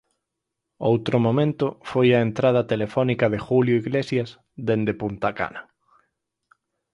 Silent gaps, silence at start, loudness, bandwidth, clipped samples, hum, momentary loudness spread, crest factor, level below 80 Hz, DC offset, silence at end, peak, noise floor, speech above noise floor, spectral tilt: none; 0.8 s; -22 LUFS; 10.5 kHz; under 0.1%; none; 8 LU; 18 dB; -56 dBFS; under 0.1%; 1.3 s; -6 dBFS; -82 dBFS; 60 dB; -8 dB/octave